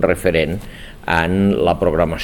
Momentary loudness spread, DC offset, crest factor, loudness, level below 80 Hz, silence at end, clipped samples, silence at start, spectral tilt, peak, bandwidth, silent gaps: 14 LU; 0.3%; 16 dB; -17 LUFS; -34 dBFS; 0 s; under 0.1%; 0 s; -6.5 dB/octave; 0 dBFS; 17.5 kHz; none